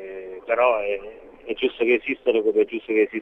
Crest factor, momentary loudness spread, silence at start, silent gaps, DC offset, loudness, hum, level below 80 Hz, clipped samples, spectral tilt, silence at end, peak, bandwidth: 16 dB; 15 LU; 0 s; none; under 0.1%; -22 LUFS; none; -58 dBFS; under 0.1%; -6.5 dB/octave; 0 s; -6 dBFS; 3.9 kHz